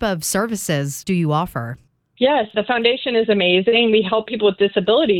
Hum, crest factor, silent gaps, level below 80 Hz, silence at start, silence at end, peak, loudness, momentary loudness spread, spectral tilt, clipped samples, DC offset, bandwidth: none; 16 dB; none; -50 dBFS; 0 s; 0 s; -2 dBFS; -18 LUFS; 7 LU; -4.5 dB/octave; under 0.1%; under 0.1%; 17 kHz